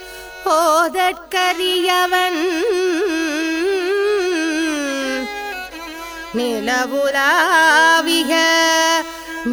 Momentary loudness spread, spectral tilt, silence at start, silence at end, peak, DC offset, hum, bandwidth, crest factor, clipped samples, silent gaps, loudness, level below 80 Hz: 13 LU; -1 dB/octave; 0 s; 0 s; -2 dBFS; under 0.1%; none; over 20 kHz; 16 dB; under 0.1%; none; -16 LUFS; -52 dBFS